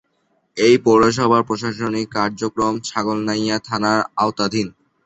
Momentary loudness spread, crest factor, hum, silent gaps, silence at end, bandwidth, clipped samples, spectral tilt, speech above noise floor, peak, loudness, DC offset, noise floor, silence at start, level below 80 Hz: 9 LU; 18 dB; none; none; 0.35 s; 8.2 kHz; under 0.1%; -5 dB/octave; 48 dB; -2 dBFS; -18 LUFS; under 0.1%; -65 dBFS; 0.55 s; -52 dBFS